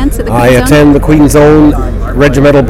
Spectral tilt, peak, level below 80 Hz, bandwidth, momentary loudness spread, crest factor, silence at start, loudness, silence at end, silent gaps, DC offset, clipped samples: -6.5 dB/octave; 0 dBFS; -16 dBFS; 16 kHz; 7 LU; 6 dB; 0 s; -6 LUFS; 0 s; none; under 0.1%; 5%